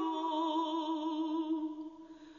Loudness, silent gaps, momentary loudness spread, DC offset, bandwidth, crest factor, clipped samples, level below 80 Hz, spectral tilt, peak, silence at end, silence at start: -35 LUFS; none; 13 LU; under 0.1%; 7.2 kHz; 14 dB; under 0.1%; -82 dBFS; -1.5 dB/octave; -22 dBFS; 0 s; 0 s